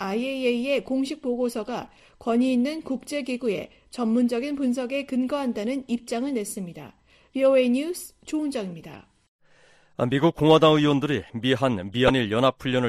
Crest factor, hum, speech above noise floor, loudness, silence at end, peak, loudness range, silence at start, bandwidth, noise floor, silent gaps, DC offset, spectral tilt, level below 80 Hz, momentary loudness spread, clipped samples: 20 dB; none; 33 dB; -24 LUFS; 0 s; -4 dBFS; 5 LU; 0 s; 13.5 kHz; -57 dBFS; 9.28-9.39 s; under 0.1%; -6 dB/octave; -54 dBFS; 14 LU; under 0.1%